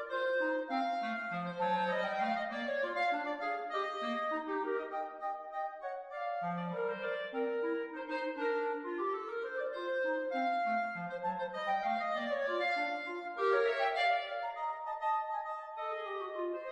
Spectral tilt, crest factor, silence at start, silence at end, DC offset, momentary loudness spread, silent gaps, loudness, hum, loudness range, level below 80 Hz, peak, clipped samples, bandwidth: -5.5 dB/octave; 16 dB; 0 s; 0 s; under 0.1%; 7 LU; none; -36 LUFS; none; 4 LU; -80 dBFS; -20 dBFS; under 0.1%; 9.8 kHz